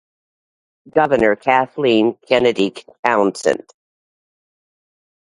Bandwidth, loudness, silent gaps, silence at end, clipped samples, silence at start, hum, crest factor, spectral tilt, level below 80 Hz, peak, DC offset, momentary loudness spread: 11.5 kHz; -17 LUFS; 2.99-3.03 s; 1.65 s; under 0.1%; 0.95 s; none; 18 dB; -5 dB/octave; -56 dBFS; 0 dBFS; under 0.1%; 6 LU